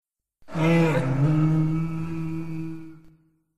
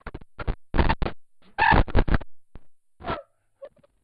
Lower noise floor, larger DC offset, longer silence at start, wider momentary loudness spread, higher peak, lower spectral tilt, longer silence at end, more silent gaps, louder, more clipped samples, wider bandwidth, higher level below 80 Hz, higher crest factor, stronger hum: first, -58 dBFS vs -48 dBFS; first, 2% vs under 0.1%; about the same, 0 s vs 0.05 s; second, 14 LU vs 18 LU; second, -10 dBFS vs -6 dBFS; about the same, -8.5 dB/octave vs -9 dB/octave; second, 0 s vs 0.35 s; neither; about the same, -24 LUFS vs -25 LUFS; neither; first, 8.8 kHz vs 5.2 kHz; second, -48 dBFS vs -30 dBFS; about the same, 14 dB vs 18 dB; neither